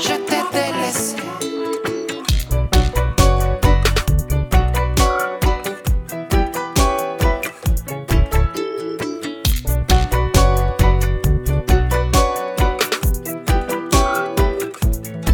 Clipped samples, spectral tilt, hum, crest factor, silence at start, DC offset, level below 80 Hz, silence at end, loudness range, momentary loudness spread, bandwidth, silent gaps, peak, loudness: under 0.1%; -5 dB/octave; none; 16 dB; 0 s; under 0.1%; -20 dBFS; 0 s; 3 LU; 7 LU; 20 kHz; none; 0 dBFS; -19 LUFS